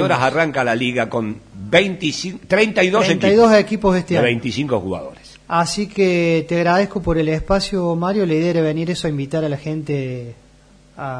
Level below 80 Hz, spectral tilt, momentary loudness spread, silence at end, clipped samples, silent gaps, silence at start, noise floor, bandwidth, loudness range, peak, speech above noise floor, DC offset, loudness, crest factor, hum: -40 dBFS; -5.5 dB/octave; 10 LU; 0 s; under 0.1%; none; 0 s; -49 dBFS; 10.5 kHz; 4 LU; -2 dBFS; 31 dB; under 0.1%; -18 LUFS; 16 dB; none